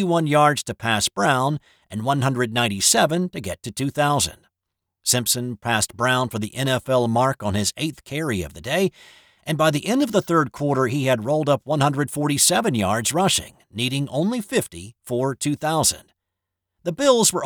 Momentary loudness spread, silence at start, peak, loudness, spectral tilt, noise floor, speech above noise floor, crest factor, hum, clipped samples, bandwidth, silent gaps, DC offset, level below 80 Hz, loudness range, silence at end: 11 LU; 0 s; -4 dBFS; -21 LUFS; -4 dB/octave; -82 dBFS; 61 dB; 18 dB; none; under 0.1%; over 20 kHz; none; under 0.1%; -54 dBFS; 3 LU; 0 s